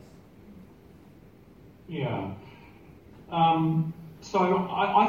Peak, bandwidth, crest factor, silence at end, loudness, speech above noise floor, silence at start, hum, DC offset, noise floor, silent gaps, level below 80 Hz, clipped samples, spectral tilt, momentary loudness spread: -8 dBFS; 7.2 kHz; 20 dB; 0 s; -27 LUFS; 27 dB; 0.5 s; none; under 0.1%; -53 dBFS; none; -62 dBFS; under 0.1%; -7 dB/octave; 18 LU